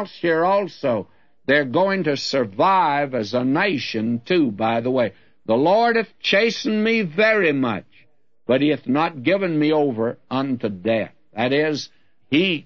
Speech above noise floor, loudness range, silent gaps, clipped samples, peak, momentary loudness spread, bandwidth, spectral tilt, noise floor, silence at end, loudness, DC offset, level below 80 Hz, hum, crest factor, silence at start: 40 dB; 3 LU; none; under 0.1%; -4 dBFS; 8 LU; 7.4 kHz; -6 dB/octave; -60 dBFS; 0.05 s; -20 LUFS; 0.2%; -66 dBFS; none; 16 dB; 0 s